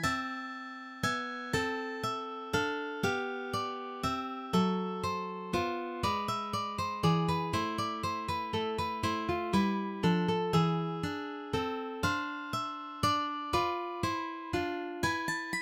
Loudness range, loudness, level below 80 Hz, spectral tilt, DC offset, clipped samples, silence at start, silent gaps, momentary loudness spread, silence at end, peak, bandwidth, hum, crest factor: 3 LU; -33 LUFS; -56 dBFS; -5.5 dB/octave; under 0.1%; under 0.1%; 0 s; none; 7 LU; 0 s; -16 dBFS; 16.5 kHz; none; 18 dB